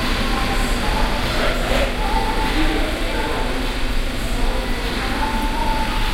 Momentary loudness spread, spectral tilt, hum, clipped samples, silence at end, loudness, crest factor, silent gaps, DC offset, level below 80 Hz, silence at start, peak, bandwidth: 4 LU; -4.5 dB/octave; none; under 0.1%; 0 s; -21 LUFS; 14 dB; none; under 0.1%; -22 dBFS; 0 s; -4 dBFS; 16 kHz